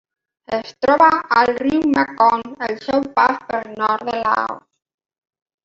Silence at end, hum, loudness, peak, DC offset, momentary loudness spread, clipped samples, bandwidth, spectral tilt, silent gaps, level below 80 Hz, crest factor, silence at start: 1.05 s; none; -18 LUFS; -2 dBFS; under 0.1%; 12 LU; under 0.1%; 7.6 kHz; -5.5 dB/octave; none; -56 dBFS; 18 dB; 0.5 s